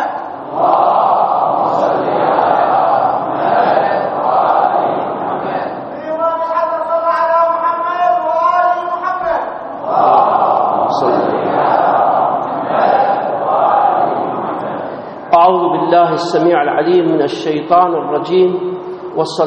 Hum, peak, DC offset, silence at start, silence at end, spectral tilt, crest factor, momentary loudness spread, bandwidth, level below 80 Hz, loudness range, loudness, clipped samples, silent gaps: none; 0 dBFS; under 0.1%; 0 s; 0 s; -4 dB/octave; 14 dB; 9 LU; 8 kHz; -58 dBFS; 3 LU; -13 LUFS; under 0.1%; none